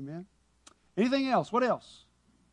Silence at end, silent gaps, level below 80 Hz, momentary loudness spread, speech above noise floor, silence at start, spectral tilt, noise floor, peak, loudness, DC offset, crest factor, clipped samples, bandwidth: 0.75 s; none; -70 dBFS; 15 LU; 32 dB; 0 s; -6 dB/octave; -62 dBFS; -16 dBFS; -29 LUFS; under 0.1%; 16 dB; under 0.1%; 10.5 kHz